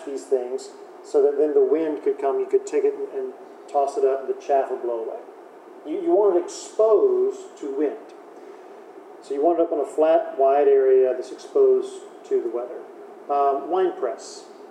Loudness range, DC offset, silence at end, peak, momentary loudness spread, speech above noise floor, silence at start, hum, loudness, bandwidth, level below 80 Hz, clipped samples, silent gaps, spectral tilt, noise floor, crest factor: 5 LU; under 0.1%; 0 s; -8 dBFS; 21 LU; 22 dB; 0 s; none; -22 LUFS; 10 kHz; under -90 dBFS; under 0.1%; none; -4 dB/octave; -44 dBFS; 16 dB